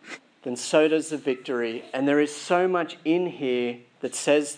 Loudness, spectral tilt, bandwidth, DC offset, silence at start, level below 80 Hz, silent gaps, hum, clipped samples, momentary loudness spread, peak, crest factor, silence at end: -25 LUFS; -4 dB/octave; 10.5 kHz; under 0.1%; 0.05 s; -86 dBFS; none; none; under 0.1%; 11 LU; -6 dBFS; 18 dB; 0 s